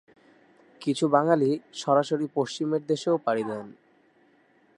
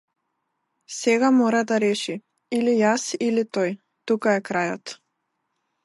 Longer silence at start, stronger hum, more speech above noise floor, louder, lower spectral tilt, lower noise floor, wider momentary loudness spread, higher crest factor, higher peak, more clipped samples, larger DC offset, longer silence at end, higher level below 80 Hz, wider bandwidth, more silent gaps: about the same, 0.8 s vs 0.9 s; neither; second, 37 dB vs 55 dB; second, -26 LUFS vs -22 LUFS; first, -6 dB/octave vs -4.5 dB/octave; second, -62 dBFS vs -76 dBFS; second, 11 LU vs 17 LU; about the same, 20 dB vs 16 dB; about the same, -6 dBFS vs -8 dBFS; neither; neither; first, 1.05 s vs 0.9 s; about the same, -78 dBFS vs -74 dBFS; about the same, 11 kHz vs 11.5 kHz; neither